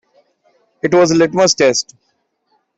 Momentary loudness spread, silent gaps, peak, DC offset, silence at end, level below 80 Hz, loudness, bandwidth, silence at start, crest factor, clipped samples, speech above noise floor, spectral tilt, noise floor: 11 LU; none; -2 dBFS; under 0.1%; 0.95 s; -56 dBFS; -13 LUFS; 8.2 kHz; 0.85 s; 14 dB; under 0.1%; 53 dB; -3.5 dB/octave; -65 dBFS